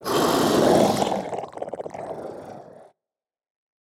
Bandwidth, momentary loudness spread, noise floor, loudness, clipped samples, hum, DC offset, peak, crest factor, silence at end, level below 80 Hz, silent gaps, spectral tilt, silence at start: over 20 kHz; 20 LU; under -90 dBFS; -22 LUFS; under 0.1%; none; under 0.1%; -4 dBFS; 20 dB; 1 s; -58 dBFS; none; -4.5 dB/octave; 0 s